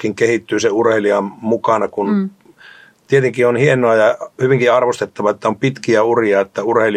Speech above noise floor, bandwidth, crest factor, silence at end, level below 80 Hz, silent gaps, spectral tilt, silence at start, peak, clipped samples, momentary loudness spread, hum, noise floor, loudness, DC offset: 29 dB; 11 kHz; 14 dB; 0 s; -62 dBFS; none; -6 dB/octave; 0 s; 0 dBFS; under 0.1%; 6 LU; none; -43 dBFS; -15 LUFS; under 0.1%